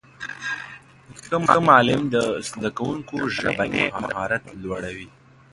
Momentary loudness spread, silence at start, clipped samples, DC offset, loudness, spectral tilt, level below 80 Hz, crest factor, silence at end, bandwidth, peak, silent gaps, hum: 17 LU; 0.2 s; under 0.1%; under 0.1%; -22 LUFS; -5 dB/octave; -52 dBFS; 22 dB; 0.45 s; 11.5 kHz; 0 dBFS; none; none